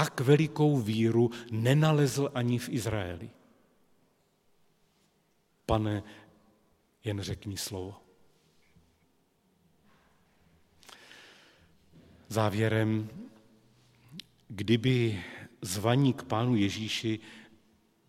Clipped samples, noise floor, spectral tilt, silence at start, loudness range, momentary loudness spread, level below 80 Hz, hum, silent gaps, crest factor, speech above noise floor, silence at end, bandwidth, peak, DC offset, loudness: under 0.1%; -71 dBFS; -6 dB/octave; 0 s; 12 LU; 23 LU; -58 dBFS; none; none; 22 dB; 43 dB; 0.65 s; 16 kHz; -10 dBFS; under 0.1%; -29 LUFS